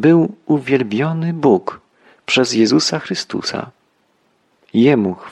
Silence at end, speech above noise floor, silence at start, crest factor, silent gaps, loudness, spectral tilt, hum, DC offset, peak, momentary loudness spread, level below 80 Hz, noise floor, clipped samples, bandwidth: 0 s; 45 dB; 0 s; 14 dB; none; -16 LUFS; -5.5 dB/octave; none; under 0.1%; -2 dBFS; 10 LU; -60 dBFS; -61 dBFS; under 0.1%; 11 kHz